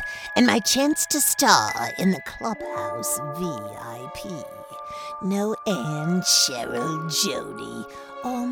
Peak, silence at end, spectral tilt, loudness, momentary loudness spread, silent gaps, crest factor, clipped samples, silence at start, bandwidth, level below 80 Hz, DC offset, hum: 0 dBFS; 0 s; -3 dB/octave; -22 LUFS; 18 LU; none; 24 dB; under 0.1%; 0 s; 19 kHz; -58 dBFS; under 0.1%; none